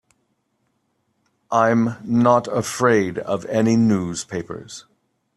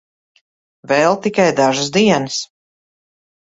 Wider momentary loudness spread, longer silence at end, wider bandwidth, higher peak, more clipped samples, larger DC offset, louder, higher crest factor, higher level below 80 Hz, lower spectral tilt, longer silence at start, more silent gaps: first, 15 LU vs 9 LU; second, 0.55 s vs 1.05 s; first, 12.5 kHz vs 8 kHz; about the same, -2 dBFS vs -2 dBFS; neither; neither; second, -19 LUFS vs -15 LUFS; about the same, 18 dB vs 16 dB; about the same, -58 dBFS vs -58 dBFS; first, -6 dB/octave vs -4 dB/octave; first, 1.5 s vs 0.9 s; neither